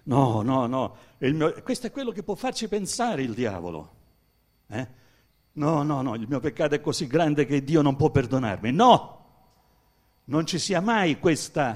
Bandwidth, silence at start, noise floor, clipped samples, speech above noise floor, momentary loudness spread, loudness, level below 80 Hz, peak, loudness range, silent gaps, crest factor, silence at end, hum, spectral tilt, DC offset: 15 kHz; 0.05 s; -66 dBFS; under 0.1%; 41 dB; 13 LU; -25 LUFS; -54 dBFS; -4 dBFS; 8 LU; none; 22 dB; 0 s; none; -5.5 dB/octave; under 0.1%